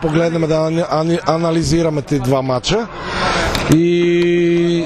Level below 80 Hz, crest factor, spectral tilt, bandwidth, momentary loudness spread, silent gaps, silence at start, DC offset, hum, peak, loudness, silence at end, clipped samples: -34 dBFS; 14 dB; -6 dB/octave; 13.5 kHz; 4 LU; none; 0 s; under 0.1%; none; 0 dBFS; -15 LUFS; 0 s; under 0.1%